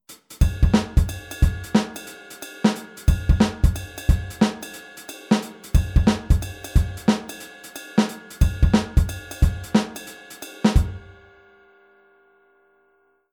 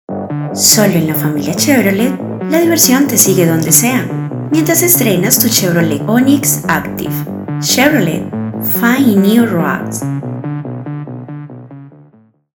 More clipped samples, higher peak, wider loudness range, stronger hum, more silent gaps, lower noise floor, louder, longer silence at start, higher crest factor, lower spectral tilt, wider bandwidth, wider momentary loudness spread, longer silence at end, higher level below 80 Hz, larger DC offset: second, under 0.1% vs 0.3%; second, -4 dBFS vs 0 dBFS; about the same, 3 LU vs 4 LU; neither; neither; first, -63 dBFS vs -47 dBFS; second, -22 LUFS vs -11 LUFS; about the same, 0.1 s vs 0.1 s; first, 18 dB vs 12 dB; first, -6 dB/octave vs -4 dB/octave; about the same, 19 kHz vs over 20 kHz; first, 18 LU vs 13 LU; first, 2.35 s vs 0.65 s; first, -26 dBFS vs -50 dBFS; neither